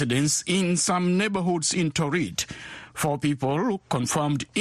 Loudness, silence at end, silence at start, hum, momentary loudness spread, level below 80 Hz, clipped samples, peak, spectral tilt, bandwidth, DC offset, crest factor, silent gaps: -24 LUFS; 0 s; 0 s; none; 7 LU; -56 dBFS; under 0.1%; -10 dBFS; -4 dB/octave; 13 kHz; under 0.1%; 14 dB; none